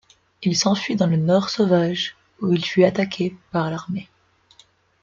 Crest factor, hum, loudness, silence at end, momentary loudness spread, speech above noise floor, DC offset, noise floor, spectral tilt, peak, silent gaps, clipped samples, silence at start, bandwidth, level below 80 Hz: 18 dB; none; -21 LUFS; 1 s; 10 LU; 36 dB; under 0.1%; -56 dBFS; -5.5 dB/octave; -4 dBFS; none; under 0.1%; 0.4 s; 7.6 kHz; -62 dBFS